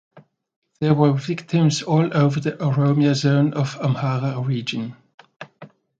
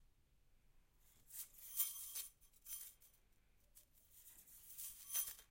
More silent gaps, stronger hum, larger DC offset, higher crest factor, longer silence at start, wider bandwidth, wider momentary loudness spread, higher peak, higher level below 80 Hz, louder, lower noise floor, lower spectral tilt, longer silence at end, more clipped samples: first, 0.56-0.62 s, 5.14-5.18 s vs none; neither; neither; second, 18 dB vs 28 dB; first, 0.15 s vs 0 s; second, 7.8 kHz vs 16.5 kHz; second, 11 LU vs 23 LU; first, -2 dBFS vs -24 dBFS; first, -62 dBFS vs -76 dBFS; first, -20 LUFS vs -46 LUFS; second, -46 dBFS vs -73 dBFS; first, -7 dB/octave vs 2 dB/octave; first, 0.35 s vs 0.05 s; neither